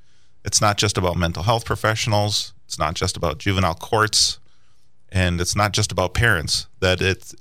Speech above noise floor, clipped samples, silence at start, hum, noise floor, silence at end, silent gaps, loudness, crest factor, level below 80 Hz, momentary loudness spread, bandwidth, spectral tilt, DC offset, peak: 43 dB; under 0.1%; 0.45 s; none; -63 dBFS; 0.1 s; none; -20 LUFS; 18 dB; -38 dBFS; 6 LU; 16 kHz; -3.5 dB/octave; 0.8%; -4 dBFS